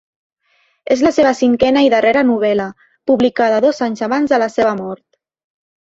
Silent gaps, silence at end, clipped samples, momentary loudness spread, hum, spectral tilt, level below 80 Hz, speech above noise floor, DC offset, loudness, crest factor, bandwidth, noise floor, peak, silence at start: none; 0.9 s; under 0.1%; 13 LU; none; -5 dB/octave; -52 dBFS; 46 dB; under 0.1%; -14 LUFS; 14 dB; 7.8 kHz; -60 dBFS; 0 dBFS; 0.85 s